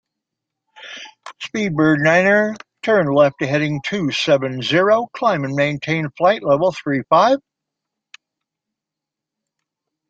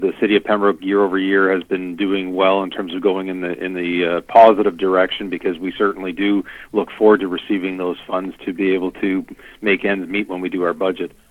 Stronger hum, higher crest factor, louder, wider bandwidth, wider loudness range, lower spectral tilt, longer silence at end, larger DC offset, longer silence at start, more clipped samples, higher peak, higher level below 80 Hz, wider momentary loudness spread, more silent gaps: neither; about the same, 18 dB vs 18 dB; about the same, -17 LUFS vs -18 LUFS; second, 7.8 kHz vs 11 kHz; about the same, 4 LU vs 5 LU; about the same, -6 dB/octave vs -7 dB/octave; first, 2.7 s vs 0.25 s; neither; first, 0.8 s vs 0 s; neither; about the same, -2 dBFS vs 0 dBFS; second, -60 dBFS vs -54 dBFS; first, 13 LU vs 10 LU; neither